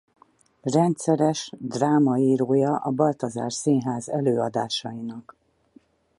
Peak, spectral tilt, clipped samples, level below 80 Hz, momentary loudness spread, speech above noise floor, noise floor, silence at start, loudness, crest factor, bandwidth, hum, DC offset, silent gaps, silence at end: -8 dBFS; -6 dB/octave; under 0.1%; -68 dBFS; 12 LU; 35 dB; -58 dBFS; 0.65 s; -23 LUFS; 16 dB; 11.5 kHz; none; under 0.1%; none; 1 s